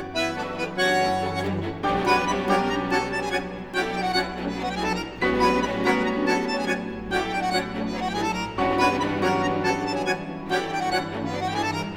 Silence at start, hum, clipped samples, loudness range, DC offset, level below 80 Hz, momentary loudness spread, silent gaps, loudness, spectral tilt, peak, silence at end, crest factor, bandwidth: 0 s; none; under 0.1%; 1 LU; 0.1%; -46 dBFS; 7 LU; none; -25 LUFS; -4.5 dB/octave; -8 dBFS; 0 s; 16 dB; 17.5 kHz